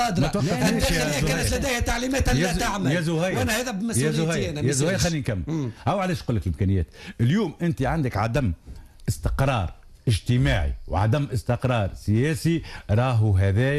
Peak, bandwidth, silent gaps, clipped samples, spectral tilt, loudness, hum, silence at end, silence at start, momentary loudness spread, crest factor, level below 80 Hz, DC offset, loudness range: -12 dBFS; 14.5 kHz; none; under 0.1%; -5.5 dB/octave; -24 LUFS; none; 0 s; 0 s; 6 LU; 12 dB; -36 dBFS; under 0.1%; 2 LU